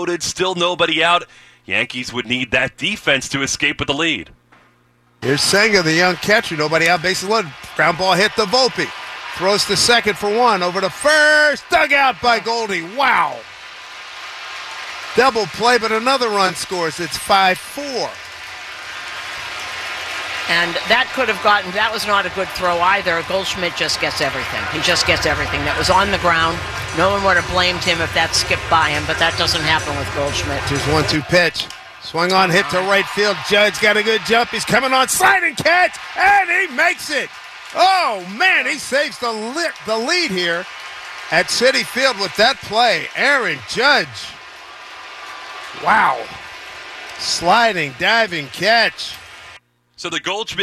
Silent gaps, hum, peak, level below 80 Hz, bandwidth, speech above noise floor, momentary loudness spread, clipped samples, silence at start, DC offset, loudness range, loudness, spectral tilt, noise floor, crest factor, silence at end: none; none; -2 dBFS; -44 dBFS; 14.5 kHz; 39 dB; 15 LU; under 0.1%; 0 s; under 0.1%; 5 LU; -16 LUFS; -2.5 dB/octave; -56 dBFS; 16 dB; 0 s